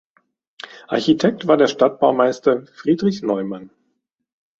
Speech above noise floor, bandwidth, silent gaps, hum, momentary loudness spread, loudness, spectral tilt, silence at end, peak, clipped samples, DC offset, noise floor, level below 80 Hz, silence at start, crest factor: 55 dB; 7.8 kHz; none; none; 17 LU; -18 LUFS; -6 dB/octave; 0.95 s; -2 dBFS; under 0.1%; under 0.1%; -72 dBFS; -62 dBFS; 0.9 s; 18 dB